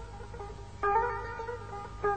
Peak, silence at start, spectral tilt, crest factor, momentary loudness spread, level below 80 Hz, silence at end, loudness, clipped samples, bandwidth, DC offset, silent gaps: -16 dBFS; 0 s; -6 dB/octave; 18 dB; 15 LU; -48 dBFS; 0 s; -34 LUFS; under 0.1%; 9 kHz; 0.2%; none